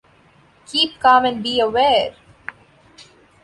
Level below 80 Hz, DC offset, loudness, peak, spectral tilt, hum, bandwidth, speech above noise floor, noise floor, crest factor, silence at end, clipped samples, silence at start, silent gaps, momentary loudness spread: -54 dBFS; under 0.1%; -17 LUFS; -2 dBFS; -3.5 dB/octave; none; 11.5 kHz; 36 dB; -53 dBFS; 18 dB; 0.4 s; under 0.1%; 0.7 s; none; 22 LU